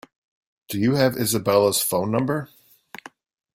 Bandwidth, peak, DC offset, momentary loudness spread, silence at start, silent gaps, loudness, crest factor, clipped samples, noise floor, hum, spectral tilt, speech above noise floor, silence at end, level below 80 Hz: 16.5 kHz; -4 dBFS; under 0.1%; 23 LU; 0.7 s; none; -21 LUFS; 20 dB; under 0.1%; -44 dBFS; none; -4.5 dB/octave; 23 dB; 1.1 s; -60 dBFS